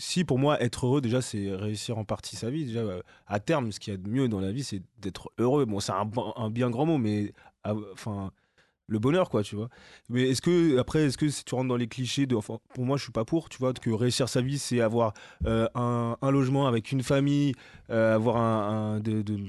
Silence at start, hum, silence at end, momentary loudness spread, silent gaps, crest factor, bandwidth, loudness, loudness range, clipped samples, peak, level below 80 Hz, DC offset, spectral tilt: 0 s; none; 0 s; 10 LU; none; 16 dB; 12.5 kHz; -28 LUFS; 5 LU; under 0.1%; -12 dBFS; -52 dBFS; under 0.1%; -6 dB/octave